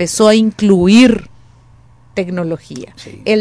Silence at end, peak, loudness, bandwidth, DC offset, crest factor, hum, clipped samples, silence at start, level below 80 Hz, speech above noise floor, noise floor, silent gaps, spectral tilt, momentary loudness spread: 0 s; 0 dBFS; -12 LUFS; 11 kHz; under 0.1%; 14 dB; none; under 0.1%; 0 s; -42 dBFS; 33 dB; -45 dBFS; none; -5 dB/octave; 20 LU